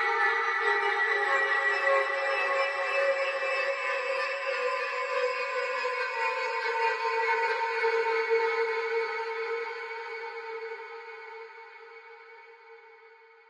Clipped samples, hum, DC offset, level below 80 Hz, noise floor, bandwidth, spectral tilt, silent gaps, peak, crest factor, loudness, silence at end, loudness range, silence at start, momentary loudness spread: under 0.1%; none; under 0.1%; under -90 dBFS; -55 dBFS; 11 kHz; 0 dB/octave; none; -14 dBFS; 16 dB; -28 LUFS; 0.35 s; 12 LU; 0 s; 17 LU